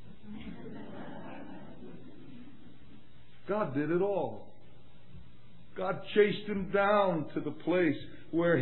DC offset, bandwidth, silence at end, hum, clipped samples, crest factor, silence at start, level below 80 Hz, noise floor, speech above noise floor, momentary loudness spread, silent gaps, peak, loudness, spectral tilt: 0.8%; 4.2 kHz; 0 s; none; under 0.1%; 20 dB; 0.05 s; -64 dBFS; -58 dBFS; 29 dB; 23 LU; none; -12 dBFS; -31 LUFS; -5 dB/octave